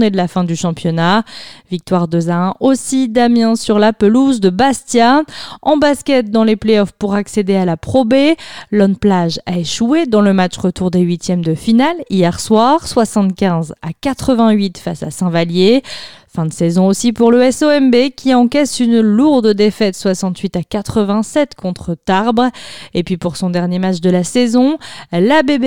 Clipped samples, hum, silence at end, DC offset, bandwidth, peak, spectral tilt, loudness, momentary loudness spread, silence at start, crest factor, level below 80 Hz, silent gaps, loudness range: under 0.1%; none; 0 s; 1%; 16 kHz; 0 dBFS; -6 dB/octave; -13 LUFS; 9 LU; 0 s; 12 dB; -46 dBFS; none; 3 LU